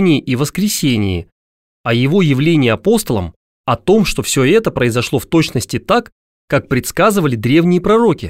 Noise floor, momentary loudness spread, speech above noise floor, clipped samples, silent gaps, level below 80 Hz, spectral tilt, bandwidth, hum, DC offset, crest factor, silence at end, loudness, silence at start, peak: under -90 dBFS; 8 LU; over 77 dB; under 0.1%; 1.32-1.84 s, 3.36-3.64 s, 6.12-6.48 s; -38 dBFS; -5.5 dB/octave; 16 kHz; none; 0.5%; 14 dB; 0 s; -14 LUFS; 0 s; 0 dBFS